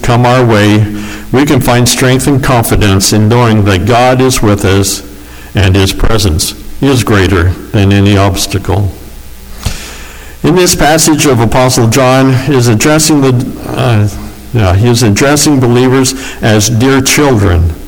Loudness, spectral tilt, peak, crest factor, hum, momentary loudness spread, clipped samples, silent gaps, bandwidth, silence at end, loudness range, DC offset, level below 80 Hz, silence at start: -8 LUFS; -5 dB/octave; 0 dBFS; 8 dB; none; 9 LU; under 0.1%; none; over 20 kHz; 0 s; 3 LU; under 0.1%; -22 dBFS; 0 s